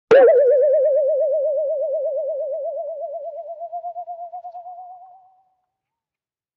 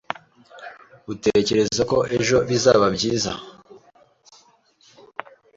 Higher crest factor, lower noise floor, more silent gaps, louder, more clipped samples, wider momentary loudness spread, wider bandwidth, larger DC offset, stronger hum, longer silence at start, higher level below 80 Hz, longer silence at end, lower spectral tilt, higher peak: about the same, 16 dB vs 20 dB; first, under -90 dBFS vs -57 dBFS; neither; about the same, -19 LUFS vs -20 LUFS; neither; about the same, 21 LU vs 23 LU; second, 6.2 kHz vs 8 kHz; neither; neither; second, 0.1 s vs 0.55 s; second, -78 dBFS vs -52 dBFS; second, 1.5 s vs 1.8 s; second, -2.5 dB/octave vs -4 dB/octave; about the same, -4 dBFS vs -4 dBFS